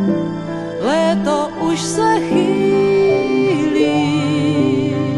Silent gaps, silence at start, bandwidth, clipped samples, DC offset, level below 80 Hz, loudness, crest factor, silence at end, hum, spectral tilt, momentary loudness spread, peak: none; 0 s; 12 kHz; under 0.1%; under 0.1%; -50 dBFS; -16 LUFS; 12 dB; 0 s; none; -6 dB/octave; 5 LU; -4 dBFS